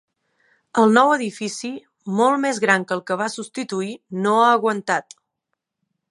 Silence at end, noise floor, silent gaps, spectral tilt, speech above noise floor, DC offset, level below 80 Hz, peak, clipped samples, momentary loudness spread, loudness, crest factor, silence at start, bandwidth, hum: 1.1 s; -79 dBFS; none; -4.5 dB/octave; 60 dB; under 0.1%; -74 dBFS; -2 dBFS; under 0.1%; 13 LU; -20 LUFS; 20 dB; 0.75 s; 11.5 kHz; none